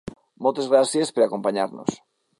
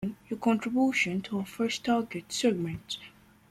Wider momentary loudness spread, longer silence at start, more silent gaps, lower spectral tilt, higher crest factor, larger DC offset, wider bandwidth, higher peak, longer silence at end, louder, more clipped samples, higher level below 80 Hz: about the same, 11 LU vs 10 LU; about the same, 0.05 s vs 0 s; neither; about the same, -4.5 dB/octave vs -4.5 dB/octave; about the same, 18 dB vs 16 dB; neither; second, 11.5 kHz vs 14.5 kHz; first, -4 dBFS vs -14 dBFS; about the same, 0.45 s vs 0.4 s; first, -22 LUFS vs -30 LUFS; neither; about the same, -60 dBFS vs -64 dBFS